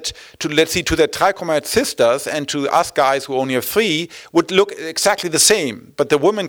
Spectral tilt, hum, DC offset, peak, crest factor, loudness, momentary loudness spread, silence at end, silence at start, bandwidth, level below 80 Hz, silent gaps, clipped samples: -2.5 dB/octave; none; under 0.1%; -2 dBFS; 16 dB; -17 LUFS; 8 LU; 0 s; 0 s; 19.5 kHz; -46 dBFS; none; under 0.1%